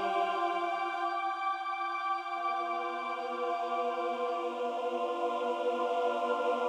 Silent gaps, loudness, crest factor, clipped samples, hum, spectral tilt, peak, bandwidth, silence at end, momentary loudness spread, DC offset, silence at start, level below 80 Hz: none; -33 LUFS; 14 dB; under 0.1%; none; -3 dB/octave; -18 dBFS; 11 kHz; 0 s; 3 LU; under 0.1%; 0 s; under -90 dBFS